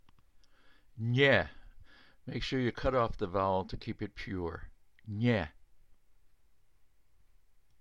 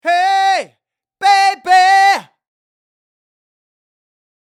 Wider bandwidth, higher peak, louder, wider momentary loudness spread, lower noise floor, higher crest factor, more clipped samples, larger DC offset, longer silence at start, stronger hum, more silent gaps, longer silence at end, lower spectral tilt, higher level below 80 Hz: second, 7.8 kHz vs 13.5 kHz; second, -12 dBFS vs -2 dBFS; second, -32 LUFS vs -12 LUFS; first, 16 LU vs 8 LU; about the same, -69 dBFS vs -68 dBFS; first, 22 dB vs 14 dB; neither; neither; first, 0.95 s vs 0.05 s; neither; neither; second, 1.8 s vs 2.35 s; first, -7 dB/octave vs 0.5 dB/octave; first, -52 dBFS vs -70 dBFS